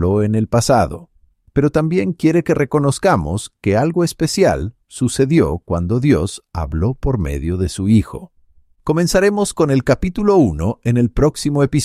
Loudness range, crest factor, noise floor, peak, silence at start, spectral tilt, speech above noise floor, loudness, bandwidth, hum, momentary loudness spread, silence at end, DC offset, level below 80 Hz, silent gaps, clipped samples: 2 LU; 14 dB; -52 dBFS; -2 dBFS; 0 s; -6.5 dB/octave; 36 dB; -17 LUFS; 15 kHz; none; 8 LU; 0 s; under 0.1%; -32 dBFS; none; under 0.1%